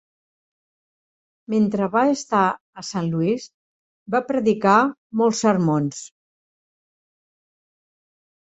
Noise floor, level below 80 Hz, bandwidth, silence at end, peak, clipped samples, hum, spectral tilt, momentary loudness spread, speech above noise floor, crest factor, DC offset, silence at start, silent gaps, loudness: under -90 dBFS; -64 dBFS; 8.2 kHz; 2.4 s; -2 dBFS; under 0.1%; none; -6 dB/octave; 11 LU; over 70 dB; 20 dB; under 0.1%; 1.5 s; 2.61-2.73 s, 3.54-4.06 s, 4.98-5.10 s; -21 LUFS